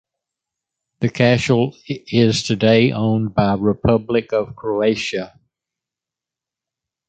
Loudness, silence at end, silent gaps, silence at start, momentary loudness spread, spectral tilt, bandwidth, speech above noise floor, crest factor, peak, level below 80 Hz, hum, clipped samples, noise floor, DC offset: -18 LUFS; 1.8 s; none; 1 s; 10 LU; -6 dB/octave; 9 kHz; 70 dB; 18 dB; -2 dBFS; -46 dBFS; none; under 0.1%; -87 dBFS; under 0.1%